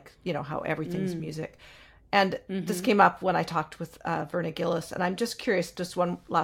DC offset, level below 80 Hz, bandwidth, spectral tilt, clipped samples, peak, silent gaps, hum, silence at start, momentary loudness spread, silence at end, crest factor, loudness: under 0.1%; -60 dBFS; 17 kHz; -5.5 dB/octave; under 0.1%; -6 dBFS; none; none; 0.05 s; 12 LU; 0 s; 24 dB; -28 LUFS